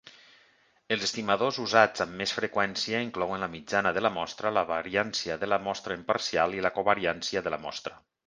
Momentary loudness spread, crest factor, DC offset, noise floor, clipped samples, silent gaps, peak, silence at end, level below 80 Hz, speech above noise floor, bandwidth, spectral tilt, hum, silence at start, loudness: 8 LU; 24 dB; under 0.1%; -64 dBFS; under 0.1%; none; -4 dBFS; 0.3 s; -62 dBFS; 35 dB; 10 kHz; -3.5 dB/octave; none; 0.05 s; -28 LUFS